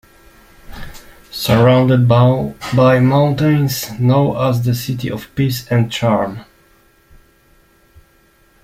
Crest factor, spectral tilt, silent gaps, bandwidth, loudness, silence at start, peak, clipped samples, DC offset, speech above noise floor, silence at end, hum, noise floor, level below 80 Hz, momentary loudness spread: 14 dB; -7 dB/octave; none; 16 kHz; -15 LUFS; 0.65 s; -2 dBFS; under 0.1%; under 0.1%; 39 dB; 2.2 s; none; -53 dBFS; -44 dBFS; 15 LU